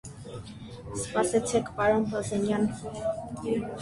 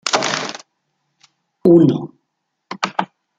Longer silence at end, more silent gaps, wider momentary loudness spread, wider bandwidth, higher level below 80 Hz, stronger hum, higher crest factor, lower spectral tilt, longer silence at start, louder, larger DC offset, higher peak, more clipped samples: second, 0 s vs 0.35 s; neither; second, 17 LU vs 24 LU; first, 11.5 kHz vs 9.2 kHz; first, -54 dBFS vs -60 dBFS; neither; about the same, 18 dB vs 18 dB; about the same, -5 dB/octave vs -5 dB/octave; about the same, 0.05 s vs 0.05 s; second, -29 LUFS vs -17 LUFS; neither; second, -10 dBFS vs 0 dBFS; neither